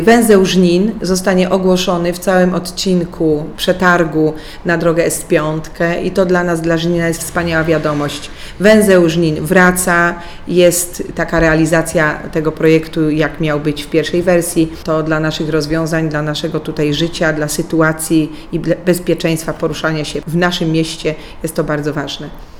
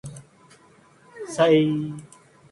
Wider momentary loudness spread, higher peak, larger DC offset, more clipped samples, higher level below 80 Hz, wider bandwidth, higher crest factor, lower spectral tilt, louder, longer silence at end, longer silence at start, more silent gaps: second, 9 LU vs 22 LU; first, 0 dBFS vs -6 dBFS; neither; neither; first, -34 dBFS vs -64 dBFS; first, 18 kHz vs 11.5 kHz; about the same, 14 dB vs 18 dB; about the same, -5 dB/octave vs -6 dB/octave; first, -14 LUFS vs -22 LUFS; second, 0 s vs 0.45 s; about the same, 0 s vs 0.05 s; neither